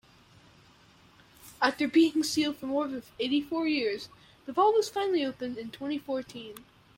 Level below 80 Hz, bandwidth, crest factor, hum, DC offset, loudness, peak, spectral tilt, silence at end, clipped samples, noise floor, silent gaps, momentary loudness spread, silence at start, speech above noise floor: -68 dBFS; 16.5 kHz; 20 dB; none; under 0.1%; -29 LUFS; -10 dBFS; -3.5 dB/octave; 0.35 s; under 0.1%; -59 dBFS; none; 17 LU; 1.45 s; 30 dB